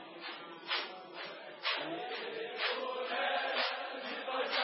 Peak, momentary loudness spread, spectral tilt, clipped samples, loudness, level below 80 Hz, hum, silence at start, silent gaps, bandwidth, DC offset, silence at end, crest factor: -20 dBFS; 11 LU; 2 dB/octave; under 0.1%; -37 LUFS; under -90 dBFS; none; 0 s; none; 5.8 kHz; under 0.1%; 0 s; 18 dB